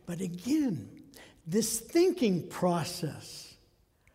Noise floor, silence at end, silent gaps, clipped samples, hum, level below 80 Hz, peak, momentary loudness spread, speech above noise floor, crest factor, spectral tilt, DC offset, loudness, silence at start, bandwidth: -66 dBFS; 0.6 s; none; under 0.1%; none; -64 dBFS; -16 dBFS; 21 LU; 36 dB; 16 dB; -5 dB/octave; under 0.1%; -30 LUFS; 0.05 s; 16 kHz